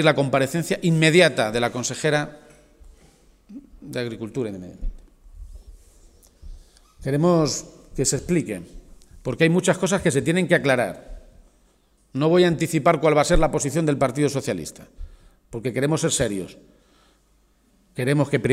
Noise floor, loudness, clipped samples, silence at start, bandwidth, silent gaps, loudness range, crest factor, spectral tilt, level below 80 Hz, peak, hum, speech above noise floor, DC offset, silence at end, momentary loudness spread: -61 dBFS; -21 LUFS; under 0.1%; 0 s; 16 kHz; none; 14 LU; 20 dB; -5 dB/octave; -38 dBFS; -2 dBFS; none; 40 dB; under 0.1%; 0 s; 17 LU